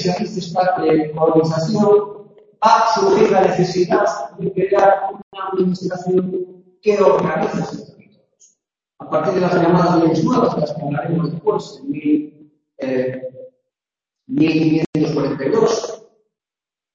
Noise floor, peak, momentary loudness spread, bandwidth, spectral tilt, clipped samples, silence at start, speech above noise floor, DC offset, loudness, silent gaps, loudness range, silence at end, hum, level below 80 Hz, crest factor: -90 dBFS; 0 dBFS; 12 LU; 7.6 kHz; -6.5 dB/octave; under 0.1%; 0 s; 73 dB; under 0.1%; -17 LUFS; 5.23-5.31 s, 14.86-14.93 s; 6 LU; 1 s; none; -56 dBFS; 18 dB